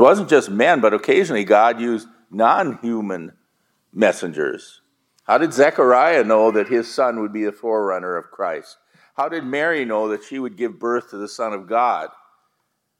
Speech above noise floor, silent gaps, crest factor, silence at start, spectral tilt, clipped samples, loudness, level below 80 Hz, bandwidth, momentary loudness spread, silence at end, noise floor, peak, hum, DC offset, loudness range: 54 dB; none; 18 dB; 0 s; -5 dB/octave; under 0.1%; -19 LUFS; -74 dBFS; 13 kHz; 13 LU; 0.9 s; -72 dBFS; 0 dBFS; none; under 0.1%; 7 LU